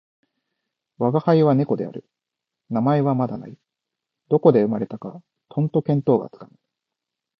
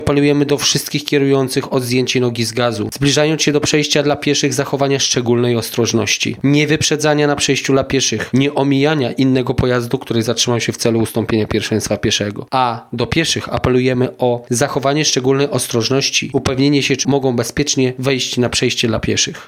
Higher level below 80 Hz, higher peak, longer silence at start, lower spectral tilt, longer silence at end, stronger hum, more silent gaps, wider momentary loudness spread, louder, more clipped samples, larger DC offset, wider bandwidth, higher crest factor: second, -66 dBFS vs -42 dBFS; about the same, 0 dBFS vs 0 dBFS; first, 1 s vs 0 s; first, -11 dB/octave vs -4 dB/octave; first, 0.95 s vs 0 s; neither; neither; first, 17 LU vs 4 LU; second, -21 LUFS vs -15 LUFS; neither; neither; second, 5.8 kHz vs 16.5 kHz; first, 22 dB vs 16 dB